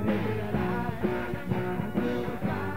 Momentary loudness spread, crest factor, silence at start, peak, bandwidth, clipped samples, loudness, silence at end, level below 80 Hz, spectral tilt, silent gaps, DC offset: 2 LU; 16 dB; 0 s; -14 dBFS; 16 kHz; under 0.1%; -30 LUFS; 0 s; -46 dBFS; -8 dB/octave; none; 1%